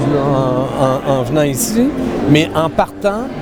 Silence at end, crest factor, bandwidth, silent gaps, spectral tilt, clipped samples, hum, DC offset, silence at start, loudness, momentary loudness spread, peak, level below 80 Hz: 0 s; 14 dB; over 20 kHz; none; -5.5 dB/octave; under 0.1%; none; under 0.1%; 0 s; -15 LUFS; 4 LU; 0 dBFS; -36 dBFS